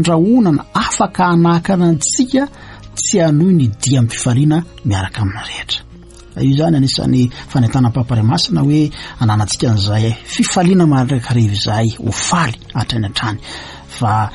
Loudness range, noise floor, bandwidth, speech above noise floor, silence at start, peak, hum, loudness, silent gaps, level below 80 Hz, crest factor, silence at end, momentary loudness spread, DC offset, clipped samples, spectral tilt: 3 LU; -37 dBFS; 11.5 kHz; 23 dB; 0 s; -2 dBFS; none; -14 LUFS; none; -38 dBFS; 12 dB; 0 s; 9 LU; under 0.1%; under 0.1%; -5.5 dB/octave